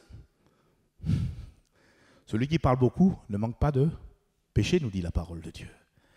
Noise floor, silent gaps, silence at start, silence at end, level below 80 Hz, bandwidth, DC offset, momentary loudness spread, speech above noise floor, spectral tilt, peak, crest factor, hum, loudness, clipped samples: -68 dBFS; none; 0.15 s; 0.5 s; -44 dBFS; 11 kHz; under 0.1%; 19 LU; 41 dB; -7.5 dB/octave; -12 dBFS; 18 dB; none; -28 LUFS; under 0.1%